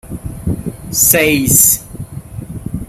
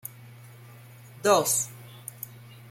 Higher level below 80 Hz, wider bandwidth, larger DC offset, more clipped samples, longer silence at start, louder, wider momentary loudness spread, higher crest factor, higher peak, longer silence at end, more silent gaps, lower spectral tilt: first, -34 dBFS vs -72 dBFS; first, over 20 kHz vs 16.5 kHz; neither; first, 0.1% vs under 0.1%; about the same, 0.05 s vs 0.05 s; first, -10 LUFS vs -24 LUFS; second, 21 LU vs 27 LU; second, 16 dB vs 22 dB; first, 0 dBFS vs -8 dBFS; about the same, 0.05 s vs 0.15 s; neither; about the same, -3 dB/octave vs -2.5 dB/octave